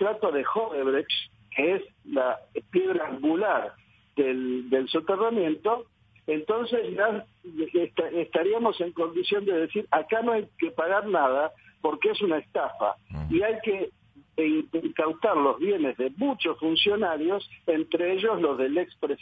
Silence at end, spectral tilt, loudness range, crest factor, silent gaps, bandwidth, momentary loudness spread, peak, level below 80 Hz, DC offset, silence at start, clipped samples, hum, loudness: 0.05 s; -8 dB/octave; 2 LU; 18 dB; none; 5 kHz; 7 LU; -10 dBFS; -58 dBFS; under 0.1%; 0 s; under 0.1%; none; -27 LUFS